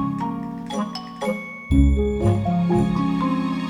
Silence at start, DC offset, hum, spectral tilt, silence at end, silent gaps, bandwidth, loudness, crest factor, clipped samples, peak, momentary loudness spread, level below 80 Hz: 0 s; under 0.1%; none; -8 dB/octave; 0 s; none; 12 kHz; -22 LUFS; 16 dB; under 0.1%; -6 dBFS; 10 LU; -28 dBFS